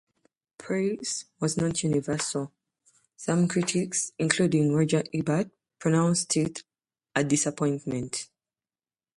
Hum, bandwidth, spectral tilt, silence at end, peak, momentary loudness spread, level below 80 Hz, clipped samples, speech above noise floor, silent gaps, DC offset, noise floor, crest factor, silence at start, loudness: none; 11.5 kHz; -5 dB/octave; 0.9 s; -6 dBFS; 10 LU; -62 dBFS; under 0.1%; over 64 dB; none; under 0.1%; under -90 dBFS; 22 dB; 0.6 s; -27 LUFS